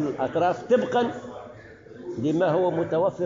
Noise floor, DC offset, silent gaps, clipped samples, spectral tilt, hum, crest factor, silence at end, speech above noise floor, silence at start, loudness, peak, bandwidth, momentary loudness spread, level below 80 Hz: -45 dBFS; under 0.1%; none; under 0.1%; -5.5 dB/octave; none; 14 dB; 0 s; 21 dB; 0 s; -24 LUFS; -10 dBFS; 7.4 kHz; 18 LU; -62 dBFS